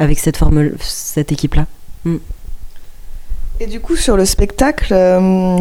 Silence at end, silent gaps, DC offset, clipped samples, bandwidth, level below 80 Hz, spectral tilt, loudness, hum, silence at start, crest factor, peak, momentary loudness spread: 0 s; none; under 0.1%; under 0.1%; 16.5 kHz; -20 dBFS; -5.5 dB/octave; -15 LUFS; none; 0 s; 14 dB; 0 dBFS; 16 LU